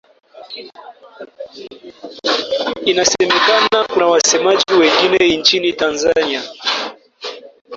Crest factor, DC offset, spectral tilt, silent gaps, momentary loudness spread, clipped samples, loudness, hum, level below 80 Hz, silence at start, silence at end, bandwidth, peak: 16 dB; under 0.1%; -1.5 dB/octave; 7.61-7.65 s; 21 LU; under 0.1%; -14 LUFS; none; -54 dBFS; 0.35 s; 0 s; 7.8 kHz; 0 dBFS